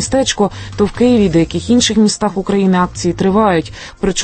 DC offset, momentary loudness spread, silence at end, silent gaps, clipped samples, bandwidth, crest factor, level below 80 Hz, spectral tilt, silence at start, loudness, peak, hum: under 0.1%; 6 LU; 0 s; none; under 0.1%; 8.8 kHz; 12 dB; -34 dBFS; -5 dB/octave; 0 s; -13 LUFS; -2 dBFS; none